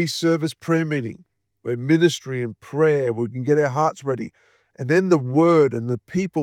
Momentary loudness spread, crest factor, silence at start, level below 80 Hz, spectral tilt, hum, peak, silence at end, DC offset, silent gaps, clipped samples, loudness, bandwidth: 12 LU; 16 dB; 0 s; -66 dBFS; -6.5 dB/octave; none; -4 dBFS; 0 s; under 0.1%; none; under 0.1%; -21 LUFS; 14.5 kHz